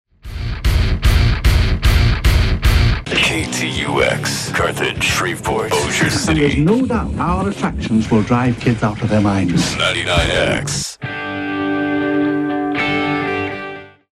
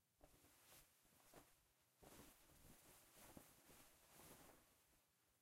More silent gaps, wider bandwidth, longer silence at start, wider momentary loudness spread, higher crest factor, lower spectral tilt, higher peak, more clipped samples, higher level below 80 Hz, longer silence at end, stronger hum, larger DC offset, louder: neither; about the same, 16 kHz vs 16 kHz; first, 0.25 s vs 0 s; first, 7 LU vs 4 LU; second, 16 dB vs 24 dB; first, -5 dB/octave vs -3 dB/octave; first, 0 dBFS vs -46 dBFS; neither; first, -22 dBFS vs -82 dBFS; first, 0.25 s vs 0 s; neither; neither; first, -17 LUFS vs -68 LUFS